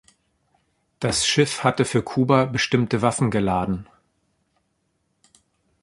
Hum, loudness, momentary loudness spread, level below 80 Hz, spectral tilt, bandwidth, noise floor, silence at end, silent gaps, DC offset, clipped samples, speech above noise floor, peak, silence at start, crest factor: none; -21 LUFS; 6 LU; -50 dBFS; -4.5 dB/octave; 11.5 kHz; -71 dBFS; 2 s; none; under 0.1%; under 0.1%; 50 dB; -2 dBFS; 1 s; 22 dB